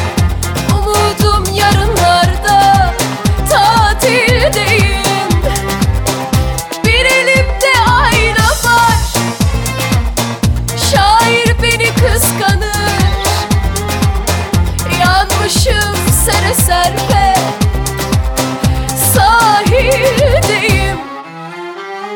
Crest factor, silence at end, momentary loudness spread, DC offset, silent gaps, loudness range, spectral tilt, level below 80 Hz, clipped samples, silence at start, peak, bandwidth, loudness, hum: 10 dB; 0 s; 7 LU; under 0.1%; none; 2 LU; -4 dB/octave; -20 dBFS; under 0.1%; 0 s; 0 dBFS; 19.5 kHz; -11 LUFS; none